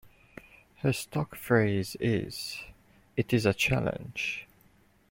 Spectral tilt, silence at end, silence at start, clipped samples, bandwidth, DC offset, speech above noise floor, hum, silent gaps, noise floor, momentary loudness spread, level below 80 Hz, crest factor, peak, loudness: -5.5 dB/octave; 0.65 s; 0.05 s; under 0.1%; 16.5 kHz; under 0.1%; 34 dB; none; none; -63 dBFS; 14 LU; -56 dBFS; 22 dB; -8 dBFS; -30 LUFS